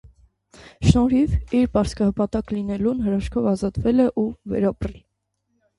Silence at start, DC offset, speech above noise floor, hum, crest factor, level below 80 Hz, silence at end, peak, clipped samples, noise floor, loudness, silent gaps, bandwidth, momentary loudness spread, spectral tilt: 0.05 s; under 0.1%; 52 dB; none; 22 dB; -34 dBFS; 0.8 s; 0 dBFS; under 0.1%; -73 dBFS; -21 LUFS; none; 11.5 kHz; 7 LU; -7.5 dB/octave